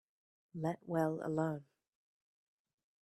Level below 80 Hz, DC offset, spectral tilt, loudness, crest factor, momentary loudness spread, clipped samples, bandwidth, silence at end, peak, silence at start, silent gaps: -80 dBFS; under 0.1%; -8.5 dB/octave; -38 LUFS; 20 dB; 10 LU; under 0.1%; 13.5 kHz; 1.4 s; -22 dBFS; 0.55 s; none